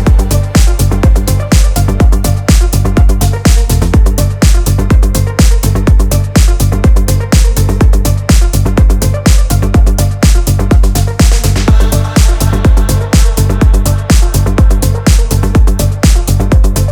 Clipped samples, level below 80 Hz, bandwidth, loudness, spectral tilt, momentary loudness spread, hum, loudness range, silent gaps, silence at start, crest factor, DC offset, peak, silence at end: 0.9%; -8 dBFS; 18.5 kHz; -10 LUFS; -5.5 dB/octave; 2 LU; none; 0 LU; none; 0 s; 6 dB; under 0.1%; 0 dBFS; 0 s